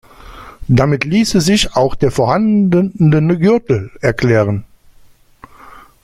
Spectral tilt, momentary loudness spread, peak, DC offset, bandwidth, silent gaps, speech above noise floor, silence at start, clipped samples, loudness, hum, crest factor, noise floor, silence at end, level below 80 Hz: -6 dB/octave; 6 LU; 0 dBFS; under 0.1%; 15 kHz; none; 33 dB; 0.3 s; under 0.1%; -13 LUFS; none; 14 dB; -45 dBFS; 0.25 s; -36 dBFS